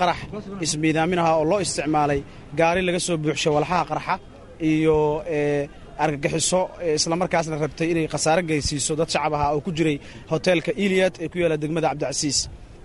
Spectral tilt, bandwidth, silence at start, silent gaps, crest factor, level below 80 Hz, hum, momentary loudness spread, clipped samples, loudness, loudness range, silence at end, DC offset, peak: -4.5 dB/octave; 11.5 kHz; 0 s; none; 18 dB; -44 dBFS; none; 7 LU; under 0.1%; -22 LUFS; 1 LU; 0.05 s; under 0.1%; -6 dBFS